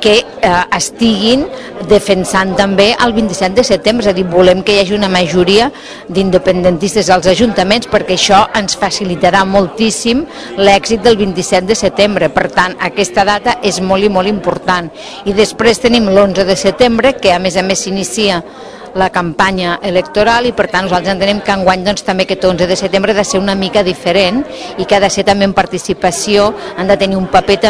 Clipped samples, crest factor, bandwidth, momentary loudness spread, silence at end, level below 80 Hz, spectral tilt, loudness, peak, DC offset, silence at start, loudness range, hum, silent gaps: 1%; 10 dB; 11 kHz; 6 LU; 0 s; -36 dBFS; -4 dB/octave; -11 LUFS; 0 dBFS; 0.2%; 0 s; 2 LU; none; none